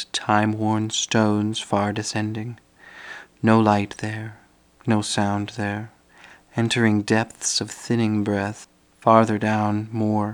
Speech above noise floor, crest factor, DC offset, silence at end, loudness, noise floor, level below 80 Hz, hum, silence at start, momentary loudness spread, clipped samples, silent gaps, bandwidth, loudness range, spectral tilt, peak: 28 dB; 22 dB; under 0.1%; 0 s; -22 LUFS; -50 dBFS; -62 dBFS; none; 0 s; 16 LU; under 0.1%; none; 12 kHz; 3 LU; -5 dB/octave; 0 dBFS